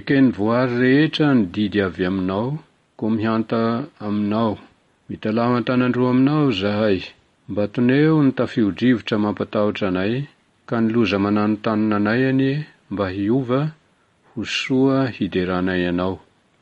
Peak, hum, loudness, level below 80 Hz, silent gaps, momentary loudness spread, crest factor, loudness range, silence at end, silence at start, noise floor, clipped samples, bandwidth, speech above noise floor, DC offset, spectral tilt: -6 dBFS; none; -20 LUFS; -56 dBFS; none; 11 LU; 14 dB; 3 LU; 0.45 s; 0.05 s; -59 dBFS; under 0.1%; 8 kHz; 40 dB; under 0.1%; -7.5 dB/octave